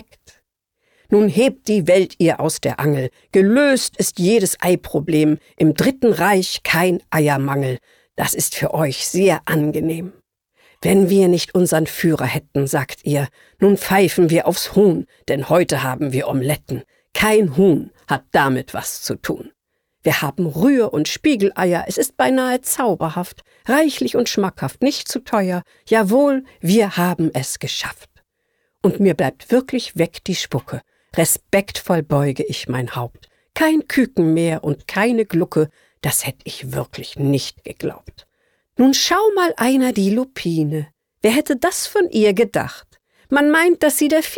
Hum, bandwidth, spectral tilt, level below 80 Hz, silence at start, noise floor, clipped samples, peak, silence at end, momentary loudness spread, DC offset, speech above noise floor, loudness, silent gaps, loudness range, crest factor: none; 20 kHz; -5 dB/octave; -52 dBFS; 1.1 s; -70 dBFS; under 0.1%; -4 dBFS; 0 s; 11 LU; under 0.1%; 52 dB; -18 LUFS; none; 4 LU; 14 dB